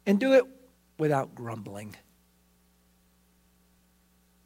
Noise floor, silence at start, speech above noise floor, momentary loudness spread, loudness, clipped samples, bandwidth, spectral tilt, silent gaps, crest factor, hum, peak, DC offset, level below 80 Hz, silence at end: -65 dBFS; 0.05 s; 39 dB; 20 LU; -27 LUFS; under 0.1%; 16 kHz; -7 dB/octave; none; 20 dB; 60 Hz at -65 dBFS; -10 dBFS; under 0.1%; -70 dBFS; 2.55 s